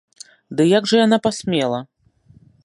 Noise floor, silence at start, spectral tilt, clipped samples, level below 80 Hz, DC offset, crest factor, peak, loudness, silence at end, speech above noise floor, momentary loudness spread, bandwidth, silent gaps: -53 dBFS; 0.5 s; -5 dB/octave; under 0.1%; -60 dBFS; under 0.1%; 18 dB; -2 dBFS; -18 LUFS; 0.8 s; 36 dB; 11 LU; 11.5 kHz; none